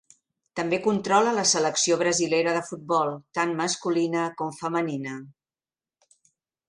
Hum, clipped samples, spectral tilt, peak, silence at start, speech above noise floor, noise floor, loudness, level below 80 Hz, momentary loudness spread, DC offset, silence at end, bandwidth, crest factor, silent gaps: none; under 0.1%; -3 dB/octave; -6 dBFS; 0.55 s; over 65 dB; under -90 dBFS; -24 LUFS; -70 dBFS; 10 LU; under 0.1%; 1.4 s; 11 kHz; 20 dB; none